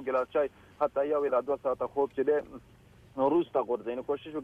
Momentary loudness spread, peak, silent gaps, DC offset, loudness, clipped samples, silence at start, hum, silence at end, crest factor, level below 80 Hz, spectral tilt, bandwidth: 7 LU; -16 dBFS; none; under 0.1%; -30 LUFS; under 0.1%; 0 s; none; 0 s; 14 dB; -64 dBFS; -7.5 dB/octave; 5.8 kHz